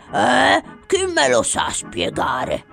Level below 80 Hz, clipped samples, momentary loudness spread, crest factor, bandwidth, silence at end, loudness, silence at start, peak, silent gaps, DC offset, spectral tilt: -46 dBFS; under 0.1%; 8 LU; 16 dB; 15 kHz; 0.1 s; -18 LUFS; 0.1 s; -2 dBFS; none; under 0.1%; -2.5 dB/octave